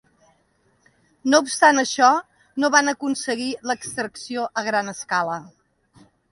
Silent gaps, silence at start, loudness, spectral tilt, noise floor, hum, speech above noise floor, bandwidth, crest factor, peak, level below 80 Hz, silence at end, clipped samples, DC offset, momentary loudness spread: none; 1.25 s; -21 LUFS; -2 dB/octave; -64 dBFS; none; 43 dB; 11.5 kHz; 22 dB; 0 dBFS; -68 dBFS; 0.85 s; under 0.1%; under 0.1%; 12 LU